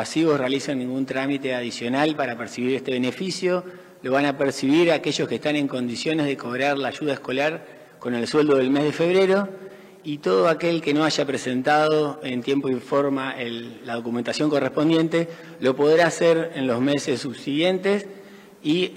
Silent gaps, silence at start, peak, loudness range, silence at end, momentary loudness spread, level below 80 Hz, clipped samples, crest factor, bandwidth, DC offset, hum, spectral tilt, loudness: none; 0 s; -6 dBFS; 3 LU; 0 s; 9 LU; -70 dBFS; under 0.1%; 18 dB; 15.5 kHz; under 0.1%; none; -5 dB/octave; -22 LUFS